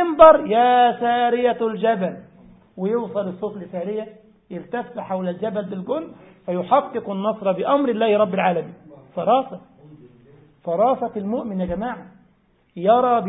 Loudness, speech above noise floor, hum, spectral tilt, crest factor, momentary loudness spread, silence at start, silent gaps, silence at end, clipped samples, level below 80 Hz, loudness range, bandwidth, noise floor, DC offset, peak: -20 LUFS; 40 dB; none; -11 dB/octave; 20 dB; 18 LU; 0 s; none; 0 s; under 0.1%; -56 dBFS; 7 LU; 4 kHz; -60 dBFS; under 0.1%; 0 dBFS